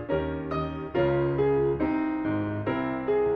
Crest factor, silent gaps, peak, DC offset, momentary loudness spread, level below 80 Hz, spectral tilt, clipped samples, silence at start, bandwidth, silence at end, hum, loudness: 12 dB; none; -14 dBFS; under 0.1%; 6 LU; -46 dBFS; -10 dB/octave; under 0.1%; 0 s; 5.4 kHz; 0 s; none; -27 LUFS